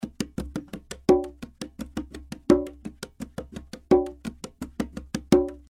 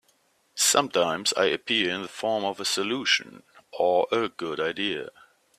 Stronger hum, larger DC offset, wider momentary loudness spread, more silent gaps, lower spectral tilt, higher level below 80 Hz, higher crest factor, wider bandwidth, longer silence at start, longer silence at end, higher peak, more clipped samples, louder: neither; neither; first, 17 LU vs 9 LU; neither; first, -6.5 dB/octave vs -1.5 dB/octave; first, -46 dBFS vs -70 dBFS; about the same, 24 dB vs 22 dB; about the same, 14.5 kHz vs 15.5 kHz; second, 0 s vs 0.55 s; second, 0.1 s vs 0.5 s; about the same, -2 dBFS vs -4 dBFS; neither; about the same, -26 LUFS vs -25 LUFS